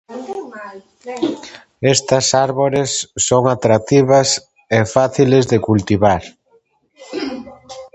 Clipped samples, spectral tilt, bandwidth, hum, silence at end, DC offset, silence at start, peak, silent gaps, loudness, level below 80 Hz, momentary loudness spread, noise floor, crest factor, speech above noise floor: under 0.1%; -4.5 dB/octave; 8.8 kHz; none; 0.1 s; under 0.1%; 0.1 s; 0 dBFS; none; -15 LUFS; -46 dBFS; 19 LU; -57 dBFS; 16 dB; 42 dB